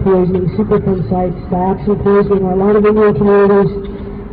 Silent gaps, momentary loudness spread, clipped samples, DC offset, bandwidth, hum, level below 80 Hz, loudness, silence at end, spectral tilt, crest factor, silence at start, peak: none; 8 LU; under 0.1%; 0.2%; 4.7 kHz; none; -30 dBFS; -12 LUFS; 0 s; -12.5 dB/octave; 10 dB; 0 s; -2 dBFS